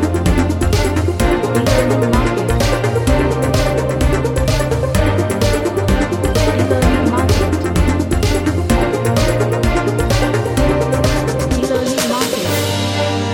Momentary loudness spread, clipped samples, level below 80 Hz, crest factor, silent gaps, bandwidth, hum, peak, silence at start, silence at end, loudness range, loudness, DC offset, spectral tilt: 2 LU; under 0.1%; -22 dBFS; 14 dB; none; 17 kHz; none; 0 dBFS; 0 s; 0 s; 1 LU; -15 LUFS; under 0.1%; -5.5 dB/octave